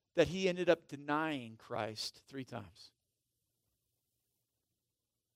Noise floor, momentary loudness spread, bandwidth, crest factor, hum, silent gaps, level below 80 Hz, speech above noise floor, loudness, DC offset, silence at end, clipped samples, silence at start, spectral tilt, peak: -89 dBFS; 16 LU; 15.5 kHz; 22 dB; none; none; -68 dBFS; 52 dB; -37 LUFS; under 0.1%; 2.5 s; under 0.1%; 0.15 s; -5 dB/octave; -16 dBFS